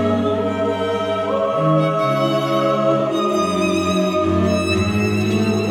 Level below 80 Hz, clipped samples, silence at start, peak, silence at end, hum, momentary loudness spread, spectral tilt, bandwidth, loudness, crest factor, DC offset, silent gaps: -54 dBFS; under 0.1%; 0 s; -6 dBFS; 0 s; none; 3 LU; -6 dB/octave; 16.5 kHz; -18 LUFS; 12 dB; under 0.1%; none